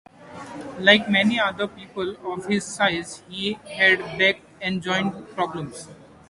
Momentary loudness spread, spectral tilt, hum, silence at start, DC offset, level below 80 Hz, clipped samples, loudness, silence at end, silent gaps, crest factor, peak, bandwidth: 19 LU; -4 dB/octave; none; 0.2 s; under 0.1%; -60 dBFS; under 0.1%; -22 LUFS; 0.25 s; none; 24 dB; 0 dBFS; 11.5 kHz